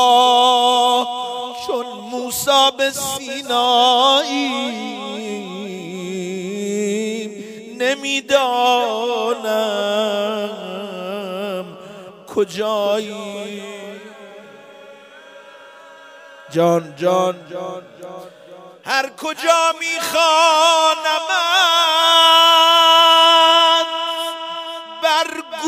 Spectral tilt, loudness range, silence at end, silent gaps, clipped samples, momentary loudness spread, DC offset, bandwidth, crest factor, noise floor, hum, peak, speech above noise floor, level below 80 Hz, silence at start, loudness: -2 dB/octave; 14 LU; 0 s; none; under 0.1%; 19 LU; under 0.1%; 16 kHz; 16 dB; -41 dBFS; none; -2 dBFS; 25 dB; -68 dBFS; 0 s; -15 LUFS